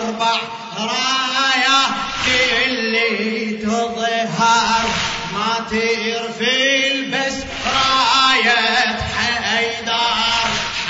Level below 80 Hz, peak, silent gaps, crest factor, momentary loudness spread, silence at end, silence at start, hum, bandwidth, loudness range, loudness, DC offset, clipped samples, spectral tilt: -44 dBFS; -4 dBFS; none; 14 dB; 8 LU; 0 s; 0 s; none; 8 kHz; 3 LU; -16 LUFS; under 0.1%; under 0.1%; -2 dB/octave